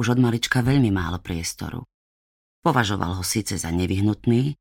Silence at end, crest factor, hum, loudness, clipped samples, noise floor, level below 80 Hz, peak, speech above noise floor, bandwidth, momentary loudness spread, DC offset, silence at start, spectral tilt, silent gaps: 0.05 s; 18 dB; none; -23 LUFS; under 0.1%; under -90 dBFS; -46 dBFS; -6 dBFS; over 68 dB; 17 kHz; 9 LU; under 0.1%; 0 s; -5 dB/octave; 1.94-2.62 s